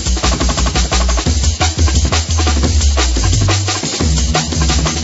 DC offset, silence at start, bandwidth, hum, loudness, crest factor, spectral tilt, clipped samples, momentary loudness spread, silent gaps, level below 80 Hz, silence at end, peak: under 0.1%; 0 s; 8 kHz; none; -14 LUFS; 12 dB; -3.5 dB/octave; under 0.1%; 2 LU; none; -16 dBFS; 0 s; 0 dBFS